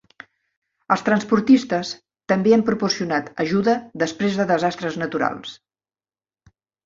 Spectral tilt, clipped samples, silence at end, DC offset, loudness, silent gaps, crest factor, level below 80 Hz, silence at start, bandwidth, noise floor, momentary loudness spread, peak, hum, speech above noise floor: -5.5 dB/octave; under 0.1%; 1.3 s; under 0.1%; -20 LUFS; none; 20 dB; -60 dBFS; 0.9 s; 7.6 kHz; under -90 dBFS; 9 LU; -2 dBFS; none; over 70 dB